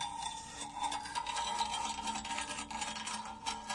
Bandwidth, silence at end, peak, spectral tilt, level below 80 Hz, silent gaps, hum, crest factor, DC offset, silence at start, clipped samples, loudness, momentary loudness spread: 11.5 kHz; 0 s; -20 dBFS; -1 dB/octave; -62 dBFS; none; none; 20 dB; under 0.1%; 0 s; under 0.1%; -38 LUFS; 6 LU